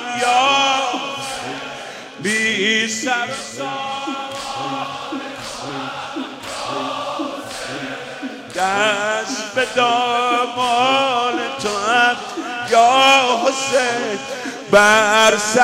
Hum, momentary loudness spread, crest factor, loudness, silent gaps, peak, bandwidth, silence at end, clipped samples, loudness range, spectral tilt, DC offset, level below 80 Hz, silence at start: none; 15 LU; 18 dB; -17 LUFS; none; -2 dBFS; 16 kHz; 0 s; under 0.1%; 11 LU; -2 dB/octave; under 0.1%; -56 dBFS; 0 s